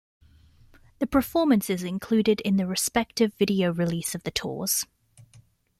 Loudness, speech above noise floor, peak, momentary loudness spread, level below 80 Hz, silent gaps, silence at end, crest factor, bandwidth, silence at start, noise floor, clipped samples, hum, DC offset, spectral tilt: -25 LUFS; 32 dB; -8 dBFS; 7 LU; -54 dBFS; none; 0.4 s; 18 dB; 16 kHz; 1 s; -57 dBFS; under 0.1%; none; under 0.1%; -4.5 dB/octave